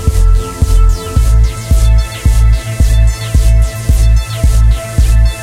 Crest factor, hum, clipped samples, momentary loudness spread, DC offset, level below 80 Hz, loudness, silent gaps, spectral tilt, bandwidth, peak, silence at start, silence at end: 8 dB; none; under 0.1%; 3 LU; under 0.1%; -10 dBFS; -12 LUFS; none; -5.5 dB/octave; 14.5 kHz; 0 dBFS; 0 s; 0 s